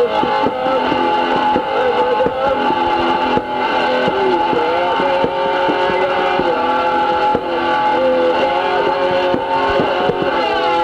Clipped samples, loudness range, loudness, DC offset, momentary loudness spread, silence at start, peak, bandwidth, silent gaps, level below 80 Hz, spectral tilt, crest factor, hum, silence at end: under 0.1%; 0 LU; -15 LUFS; under 0.1%; 2 LU; 0 s; 0 dBFS; 9.6 kHz; none; -44 dBFS; -5.5 dB/octave; 14 dB; none; 0 s